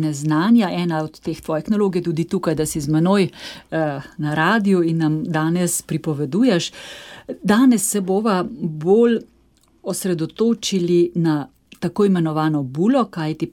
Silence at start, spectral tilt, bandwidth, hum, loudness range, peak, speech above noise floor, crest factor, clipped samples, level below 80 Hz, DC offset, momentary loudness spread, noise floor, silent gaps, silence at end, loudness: 0 s; -5.5 dB/octave; 17.5 kHz; none; 2 LU; -2 dBFS; 38 dB; 16 dB; under 0.1%; -54 dBFS; under 0.1%; 11 LU; -57 dBFS; none; 0.05 s; -19 LUFS